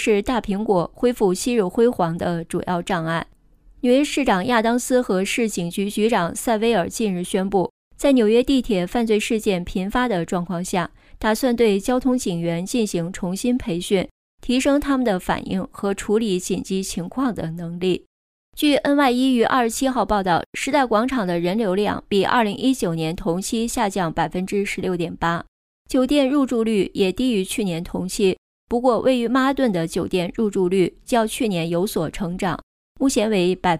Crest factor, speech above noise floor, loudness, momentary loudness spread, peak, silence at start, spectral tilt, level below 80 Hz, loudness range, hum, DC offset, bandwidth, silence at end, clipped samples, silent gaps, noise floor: 14 dB; 31 dB; -21 LUFS; 7 LU; -6 dBFS; 0 s; -5 dB/octave; -44 dBFS; 2 LU; none; under 0.1%; 15.5 kHz; 0 s; under 0.1%; 7.70-7.91 s, 14.11-14.38 s, 18.06-18.52 s, 20.46-20.53 s, 25.48-25.85 s, 28.38-28.67 s, 32.63-32.95 s; -51 dBFS